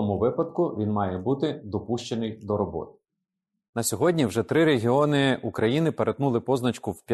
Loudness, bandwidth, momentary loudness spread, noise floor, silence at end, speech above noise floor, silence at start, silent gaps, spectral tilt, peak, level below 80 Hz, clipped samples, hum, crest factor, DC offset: -25 LUFS; 12.5 kHz; 9 LU; -85 dBFS; 0 s; 60 dB; 0 s; 3.69-3.73 s; -6 dB/octave; -10 dBFS; -58 dBFS; under 0.1%; none; 16 dB; under 0.1%